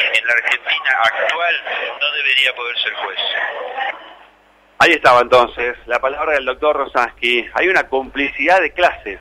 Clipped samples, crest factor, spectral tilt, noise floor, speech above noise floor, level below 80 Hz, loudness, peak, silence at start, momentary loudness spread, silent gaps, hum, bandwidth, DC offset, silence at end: under 0.1%; 16 dB; -2.5 dB/octave; -51 dBFS; 35 dB; -48 dBFS; -15 LUFS; 0 dBFS; 0 s; 9 LU; none; 50 Hz at -65 dBFS; 15.5 kHz; under 0.1%; 0 s